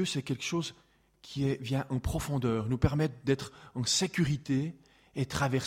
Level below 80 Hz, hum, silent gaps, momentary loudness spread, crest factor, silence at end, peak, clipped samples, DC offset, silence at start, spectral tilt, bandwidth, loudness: -48 dBFS; none; none; 9 LU; 20 dB; 0 s; -12 dBFS; under 0.1%; under 0.1%; 0 s; -5 dB/octave; 16 kHz; -32 LUFS